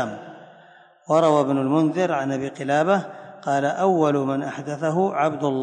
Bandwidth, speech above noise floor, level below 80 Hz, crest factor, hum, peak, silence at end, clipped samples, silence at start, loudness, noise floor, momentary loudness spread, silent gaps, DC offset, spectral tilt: 9.6 kHz; 30 dB; -72 dBFS; 16 dB; none; -6 dBFS; 0 s; under 0.1%; 0 s; -22 LUFS; -51 dBFS; 11 LU; none; under 0.1%; -6.5 dB/octave